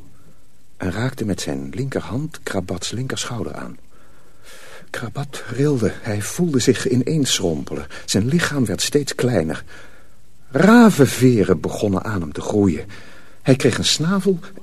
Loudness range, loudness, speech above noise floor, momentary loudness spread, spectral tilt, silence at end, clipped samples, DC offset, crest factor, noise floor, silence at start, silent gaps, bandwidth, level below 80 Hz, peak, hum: 10 LU; -19 LUFS; 34 dB; 14 LU; -5 dB/octave; 0.1 s; under 0.1%; 2%; 20 dB; -53 dBFS; 0.8 s; none; 13.5 kHz; -48 dBFS; 0 dBFS; none